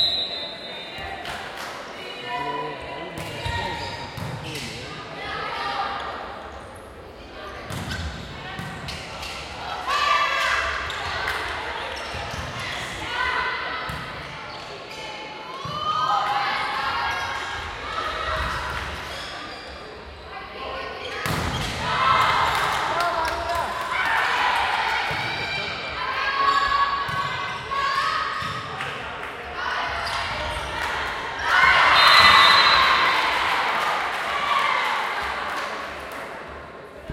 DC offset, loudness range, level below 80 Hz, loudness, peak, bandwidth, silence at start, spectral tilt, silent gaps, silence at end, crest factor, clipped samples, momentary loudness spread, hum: under 0.1%; 15 LU; -46 dBFS; -23 LUFS; -2 dBFS; 16.5 kHz; 0 s; -2.5 dB/octave; none; 0 s; 24 dB; under 0.1%; 16 LU; none